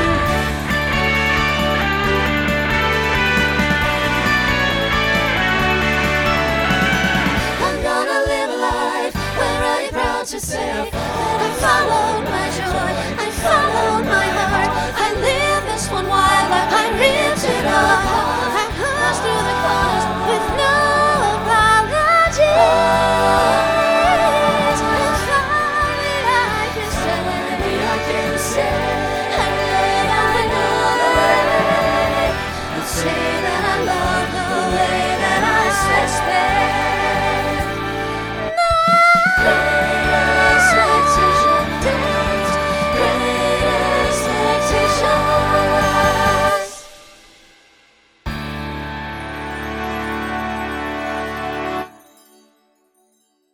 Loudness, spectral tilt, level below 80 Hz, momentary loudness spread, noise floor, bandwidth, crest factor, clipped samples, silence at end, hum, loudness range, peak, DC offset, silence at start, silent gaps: -16 LUFS; -4 dB/octave; -32 dBFS; 9 LU; -62 dBFS; over 20 kHz; 16 dB; under 0.1%; 1.65 s; none; 6 LU; 0 dBFS; under 0.1%; 0 s; none